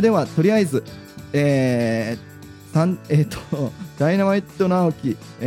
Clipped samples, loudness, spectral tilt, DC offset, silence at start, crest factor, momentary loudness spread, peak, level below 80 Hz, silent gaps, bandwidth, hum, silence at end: under 0.1%; -21 LUFS; -7.5 dB/octave; under 0.1%; 0 s; 16 dB; 11 LU; -4 dBFS; -54 dBFS; none; 16 kHz; none; 0 s